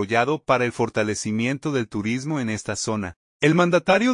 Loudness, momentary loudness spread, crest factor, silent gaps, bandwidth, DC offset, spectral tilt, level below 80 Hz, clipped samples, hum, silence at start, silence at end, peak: -22 LUFS; 8 LU; 18 dB; 3.16-3.40 s; 11 kHz; under 0.1%; -5 dB/octave; -58 dBFS; under 0.1%; none; 0 s; 0 s; -4 dBFS